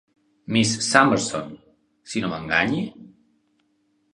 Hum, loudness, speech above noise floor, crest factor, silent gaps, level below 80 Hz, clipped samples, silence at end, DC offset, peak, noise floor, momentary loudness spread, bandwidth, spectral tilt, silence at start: none; -21 LUFS; 46 dB; 24 dB; none; -58 dBFS; under 0.1%; 1.05 s; under 0.1%; 0 dBFS; -67 dBFS; 15 LU; 11 kHz; -3.5 dB/octave; 0.5 s